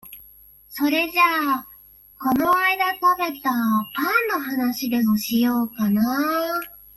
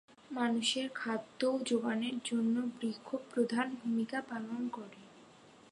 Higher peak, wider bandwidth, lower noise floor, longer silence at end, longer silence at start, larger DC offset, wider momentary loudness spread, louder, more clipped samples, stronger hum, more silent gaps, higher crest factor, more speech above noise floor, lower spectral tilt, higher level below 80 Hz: first, -6 dBFS vs -20 dBFS; first, 16.5 kHz vs 11 kHz; second, -49 dBFS vs -59 dBFS; about the same, 0.2 s vs 0.2 s; second, 0.05 s vs 0.3 s; neither; about the same, 8 LU vs 9 LU; first, -21 LUFS vs -35 LUFS; neither; first, 50 Hz at -65 dBFS vs none; neither; about the same, 16 dB vs 16 dB; first, 28 dB vs 24 dB; about the same, -4 dB/octave vs -4 dB/octave; first, -58 dBFS vs -84 dBFS